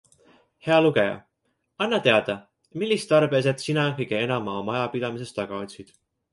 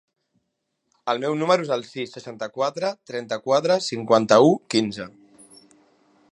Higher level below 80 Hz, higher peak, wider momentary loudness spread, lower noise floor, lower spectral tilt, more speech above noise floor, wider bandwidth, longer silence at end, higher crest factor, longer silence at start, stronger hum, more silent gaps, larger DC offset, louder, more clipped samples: first, -64 dBFS vs -70 dBFS; about the same, -4 dBFS vs -2 dBFS; about the same, 15 LU vs 17 LU; about the same, -74 dBFS vs -76 dBFS; about the same, -5.5 dB/octave vs -5 dB/octave; second, 51 dB vs 55 dB; about the same, 11.5 kHz vs 11.5 kHz; second, 0.5 s vs 1.2 s; about the same, 20 dB vs 22 dB; second, 0.65 s vs 1.05 s; neither; neither; neither; about the same, -24 LUFS vs -22 LUFS; neither